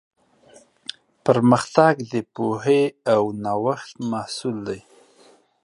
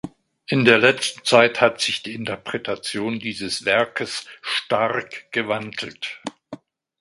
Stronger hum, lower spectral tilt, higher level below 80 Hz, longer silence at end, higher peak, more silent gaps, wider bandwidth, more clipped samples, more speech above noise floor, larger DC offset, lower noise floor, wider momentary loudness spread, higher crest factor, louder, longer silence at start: neither; first, -6 dB/octave vs -3.5 dB/octave; about the same, -64 dBFS vs -62 dBFS; first, 0.85 s vs 0.45 s; about the same, 0 dBFS vs 0 dBFS; neither; about the same, 11 kHz vs 11.5 kHz; neither; first, 34 dB vs 20 dB; neither; first, -55 dBFS vs -42 dBFS; first, 18 LU vs 15 LU; about the same, 22 dB vs 22 dB; about the same, -21 LUFS vs -21 LUFS; first, 1.25 s vs 0.05 s